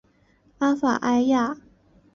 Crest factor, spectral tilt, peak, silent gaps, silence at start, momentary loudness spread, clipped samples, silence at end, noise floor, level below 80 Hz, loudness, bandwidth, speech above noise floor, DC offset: 14 dB; -5 dB/octave; -10 dBFS; none; 0.6 s; 8 LU; under 0.1%; 0.6 s; -61 dBFS; -62 dBFS; -23 LUFS; 7.2 kHz; 39 dB; under 0.1%